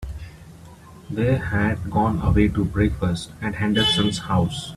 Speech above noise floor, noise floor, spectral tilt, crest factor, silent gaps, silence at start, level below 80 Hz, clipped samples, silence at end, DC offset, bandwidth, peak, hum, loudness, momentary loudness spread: 23 dB; -44 dBFS; -6 dB/octave; 18 dB; none; 0 s; -34 dBFS; under 0.1%; 0 s; under 0.1%; 13.5 kHz; -4 dBFS; none; -22 LUFS; 11 LU